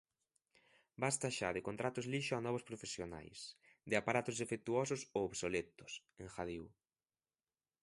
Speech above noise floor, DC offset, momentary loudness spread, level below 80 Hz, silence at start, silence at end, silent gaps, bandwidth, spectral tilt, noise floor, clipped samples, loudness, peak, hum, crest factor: over 49 dB; under 0.1%; 13 LU; -70 dBFS; 1 s; 1.15 s; none; 11.5 kHz; -4 dB/octave; under -90 dBFS; under 0.1%; -41 LUFS; -20 dBFS; none; 24 dB